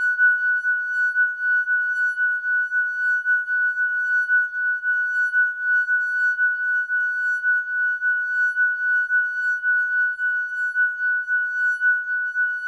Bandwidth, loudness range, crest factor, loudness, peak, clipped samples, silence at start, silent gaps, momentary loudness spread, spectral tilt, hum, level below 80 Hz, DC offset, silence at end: 11 kHz; 1 LU; 12 dB; -20 LUFS; -10 dBFS; under 0.1%; 0 s; none; 3 LU; 2.5 dB/octave; none; -78 dBFS; under 0.1%; 0 s